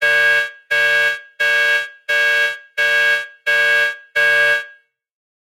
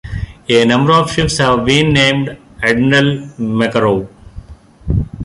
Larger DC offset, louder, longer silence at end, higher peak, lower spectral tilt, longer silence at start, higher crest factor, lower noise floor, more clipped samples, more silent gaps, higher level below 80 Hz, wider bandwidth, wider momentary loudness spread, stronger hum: neither; about the same, -15 LUFS vs -13 LUFS; first, 0.8 s vs 0 s; second, -4 dBFS vs 0 dBFS; second, 0.5 dB/octave vs -5 dB/octave; about the same, 0 s vs 0.05 s; about the same, 12 dB vs 14 dB; first, -47 dBFS vs -34 dBFS; neither; neither; second, -78 dBFS vs -30 dBFS; first, 16.5 kHz vs 11.5 kHz; second, 6 LU vs 12 LU; neither